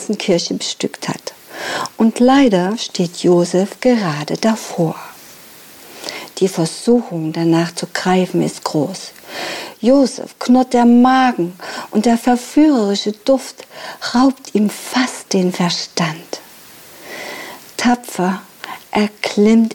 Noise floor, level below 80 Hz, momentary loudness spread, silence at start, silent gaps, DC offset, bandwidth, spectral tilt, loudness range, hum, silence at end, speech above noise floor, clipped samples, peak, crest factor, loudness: -40 dBFS; -54 dBFS; 17 LU; 0 s; none; under 0.1%; 19 kHz; -5 dB/octave; 6 LU; none; 0 s; 25 dB; under 0.1%; -2 dBFS; 14 dB; -16 LUFS